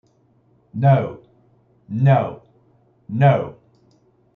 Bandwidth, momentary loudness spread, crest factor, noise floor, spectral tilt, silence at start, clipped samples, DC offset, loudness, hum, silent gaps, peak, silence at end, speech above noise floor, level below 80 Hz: 3.9 kHz; 14 LU; 18 dB; -59 dBFS; -10.5 dB/octave; 0.75 s; under 0.1%; under 0.1%; -19 LUFS; none; none; -4 dBFS; 0.85 s; 42 dB; -62 dBFS